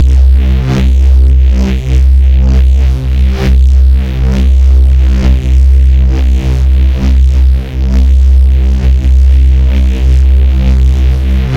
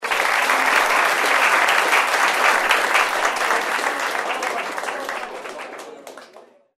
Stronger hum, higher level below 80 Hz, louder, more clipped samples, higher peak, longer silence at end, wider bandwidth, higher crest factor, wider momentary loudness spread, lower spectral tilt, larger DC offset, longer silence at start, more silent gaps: neither; first, -6 dBFS vs -62 dBFS; first, -9 LUFS vs -18 LUFS; neither; about the same, 0 dBFS vs -2 dBFS; second, 0 s vs 0.4 s; second, 6.2 kHz vs 16 kHz; second, 6 dB vs 18 dB; second, 4 LU vs 16 LU; first, -8 dB/octave vs 0.5 dB/octave; neither; about the same, 0 s vs 0 s; neither